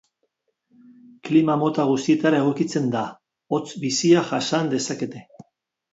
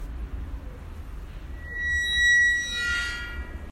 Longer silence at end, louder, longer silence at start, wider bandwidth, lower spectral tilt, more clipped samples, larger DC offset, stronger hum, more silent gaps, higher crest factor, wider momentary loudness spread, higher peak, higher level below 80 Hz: first, 0.7 s vs 0 s; about the same, -22 LUFS vs -22 LUFS; first, 1.25 s vs 0 s; second, 8 kHz vs 14.5 kHz; first, -5 dB/octave vs -1.5 dB/octave; neither; neither; neither; neither; about the same, 18 dB vs 14 dB; second, 12 LU vs 23 LU; first, -4 dBFS vs -12 dBFS; second, -68 dBFS vs -38 dBFS